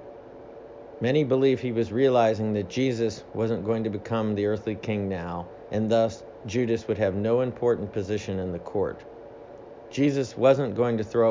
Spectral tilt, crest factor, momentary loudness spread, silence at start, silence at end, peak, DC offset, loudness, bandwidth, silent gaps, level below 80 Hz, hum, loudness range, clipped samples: -7 dB/octave; 18 dB; 22 LU; 0 s; 0 s; -6 dBFS; under 0.1%; -26 LUFS; 7.6 kHz; none; -54 dBFS; none; 3 LU; under 0.1%